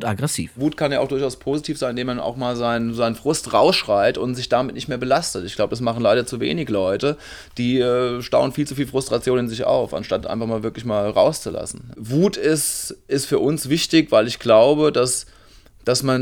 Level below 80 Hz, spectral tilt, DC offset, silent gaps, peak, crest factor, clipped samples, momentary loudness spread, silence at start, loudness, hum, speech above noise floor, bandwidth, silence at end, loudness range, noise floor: -48 dBFS; -4.5 dB/octave; under 0.1%; none; -2 dBFS; 18 dB; under 0.1%; 9 LU; 0 s; -20 LUFS; none; 28 dB; 20 kHz; 0 s; 4 LU; -48 dBFS